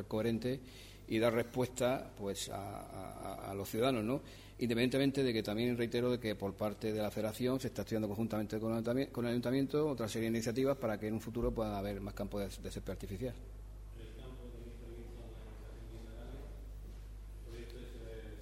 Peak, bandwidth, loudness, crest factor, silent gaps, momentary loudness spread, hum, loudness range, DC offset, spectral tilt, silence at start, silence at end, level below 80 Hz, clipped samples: -20 dBFS; 16 kHz; -37 LUFS; 18 dB; none; 18 LU; 50 Hz at -55 dBFS; 15 LU; under 0.1%; -6 dB/octave; 0 s; 0 s; -52 dBFS; under 0.1%